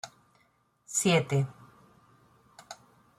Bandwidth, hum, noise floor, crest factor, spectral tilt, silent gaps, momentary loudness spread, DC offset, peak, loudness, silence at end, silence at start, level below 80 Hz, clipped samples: 15 kHz; none; -69 dBFS; 20 dB; -4.5 dB/octave; none; 24 LU; under 0.1%; -12 dBFS; -28 LUFS; 0.45 s; 0.05 s; -70 dBFS; under 0.1%